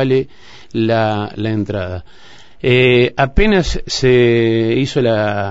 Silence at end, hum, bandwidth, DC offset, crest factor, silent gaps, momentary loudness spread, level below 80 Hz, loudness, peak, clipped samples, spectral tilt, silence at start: 0 s; none; 8 kHz; 1%; 14 dB; none; 11 LU; -28 dBFS; -15 LUFS; 0 dBFS; under 0.1%; -6 dB/octave; 0 s